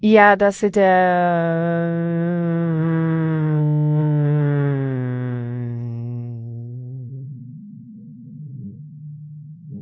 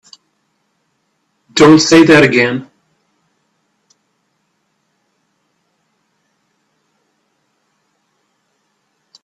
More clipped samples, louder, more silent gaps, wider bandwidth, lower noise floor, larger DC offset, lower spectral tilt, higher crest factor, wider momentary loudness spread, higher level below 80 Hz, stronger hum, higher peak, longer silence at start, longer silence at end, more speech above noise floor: neither; second, -19 LUFS vs -9 LUFS; neither; second, 8 kHz vs 11 kHz; second, -39 dBFS vs -65 dBFS; neither; first, -8.5 dB/octave vs -4.5 dB/octave; about the same, 20 dB vs 16 dB; first, 22 LU vs 13 LU; second, -60 dBFS vs -52 dBFS; neither; about the same, 0 dBFS vs 0 dBFS; second, 0 s vs 1.55 s; second, 0 s vs 6.6 s; second, 23 dB vs 57 dB